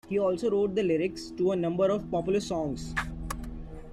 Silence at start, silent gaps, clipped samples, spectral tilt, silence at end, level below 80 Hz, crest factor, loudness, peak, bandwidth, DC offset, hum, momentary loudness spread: 0.05 s; none; under 0.1%; -6 dB/octave; 0 s; -46 dBFS; 14 dB; -29 LUFS; -14 dBFS; 14.5 kHz; under 0.1%; none; 11 LU